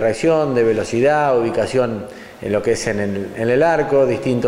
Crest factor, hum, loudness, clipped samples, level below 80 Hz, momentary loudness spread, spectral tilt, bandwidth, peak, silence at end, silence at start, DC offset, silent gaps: 14 dB; none; -17 LUFS; under 0.1%; -46 dBFS; 8 LU; -6 dB/octave; 13.5 kHz; -4 dBFS; 0 s; 0 s; under 0.1%; none